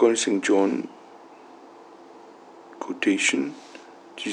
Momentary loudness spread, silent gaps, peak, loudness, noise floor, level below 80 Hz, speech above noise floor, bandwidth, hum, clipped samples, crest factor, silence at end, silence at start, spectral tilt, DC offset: 23 LU; none; -6 dBFS; -23 LUFS; -47 dBFS; -90 dBFS; 24 dB; 11 kHz; none; under 0.1%; 20 dB; 0 s; 0 s; -3 dB/octave; under 0.1%